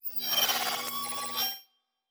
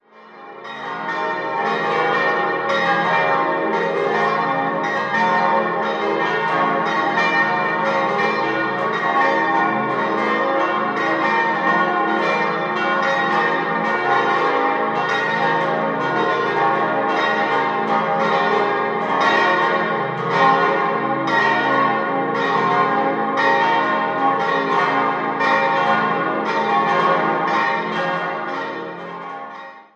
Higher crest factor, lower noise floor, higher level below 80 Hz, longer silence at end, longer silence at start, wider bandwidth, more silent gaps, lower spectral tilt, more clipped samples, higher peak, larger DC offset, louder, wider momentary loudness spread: about the same, 20 dB vs 18 dB; first, -65 dBFS vs -41 dBFS; second, -74 dBFS vs -68 dBFS; first, 0.5 s vs 0.15 s; about the same, 0.05 s vs 0.15 s; first, over 20 kHz vs 8.8 kHz; neither; second, 0.5 dB/octave vs -5.5 dB/octave; neither; second, -12 dBFS vs -2 dBFS; neither; second, -29 LUFS vs -18 LUFS; about the same, 7 LU vs 5 LU